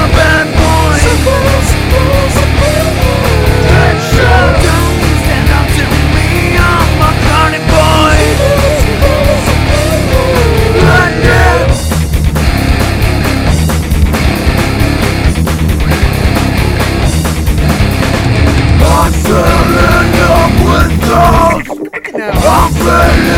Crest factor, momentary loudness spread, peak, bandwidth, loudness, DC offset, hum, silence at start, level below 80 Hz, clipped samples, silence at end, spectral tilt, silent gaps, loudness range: 8 dB; 4 LU; 0 dBFS; 16.5 kHz; -9 LUFS; under 0.1%; none; 0 s; -14 dBFS; 1%; 0 s; -5.5 dB/octave; none; 3 LU